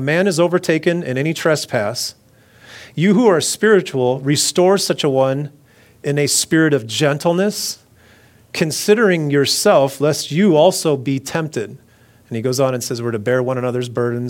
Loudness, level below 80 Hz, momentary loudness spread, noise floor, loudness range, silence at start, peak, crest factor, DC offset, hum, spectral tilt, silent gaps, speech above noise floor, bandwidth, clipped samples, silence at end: -16 LUFS; -62 dBFS; 11 LU; -49 dBFS; 3 LU; 0 s; 0 dBFS; 16 dB; under 0.1%; none; -4.5 dB/octave; none; 33 dB; 17.5 kHz; under 0.1%; 0 s